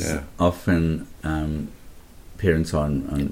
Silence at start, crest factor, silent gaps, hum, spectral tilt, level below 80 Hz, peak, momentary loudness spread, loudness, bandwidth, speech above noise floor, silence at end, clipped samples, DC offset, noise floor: 0 s; 20 dB; none; none; -6.5 dB/octave; -36 dBFS; -4 dBFS; 8 LU; -24 LUFS; 16.5 kHz; 20 dB; 0 s; under 0.1%; under 0.1%; -43 dBFS